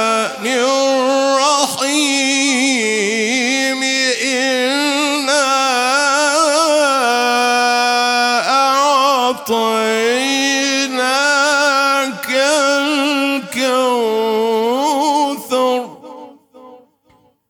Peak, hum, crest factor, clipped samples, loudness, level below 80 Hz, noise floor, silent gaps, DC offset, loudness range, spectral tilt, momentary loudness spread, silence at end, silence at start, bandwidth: 0 dBFS; none; 14 dB; under 0.1%; -14 LUFS; -72 dBFS; -54 dBFS; none; under 0.1%; 3 LU; -1 dB/octave; 4 LU; 0.75 s; 0 s; 19 kHz